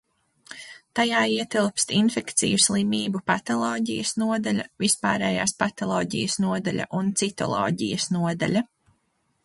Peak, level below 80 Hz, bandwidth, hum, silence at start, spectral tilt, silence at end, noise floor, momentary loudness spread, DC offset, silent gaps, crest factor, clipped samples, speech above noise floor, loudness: -6 dBFS; -60 dBFS; 11.5 kHz; none; 0.5 s; -3.5 dB/octave; 0.8 s; -71 dBFS; 6 LU; under 0.1%; none; 18 dB; under 0.1%; 47 dB; -24 LUFS